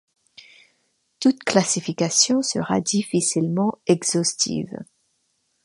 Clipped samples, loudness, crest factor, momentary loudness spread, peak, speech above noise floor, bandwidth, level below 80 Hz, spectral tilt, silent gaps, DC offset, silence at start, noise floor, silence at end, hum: under 0.1%; -21 LUFS; 22 dB; 6 LU; -2 dBFS; 49 dB; 11.5 kHz; -64 dBFS; -3.5 dB/octave; none; under 0.1%; 1.2 s; -70 dBFS; 0.8 s; none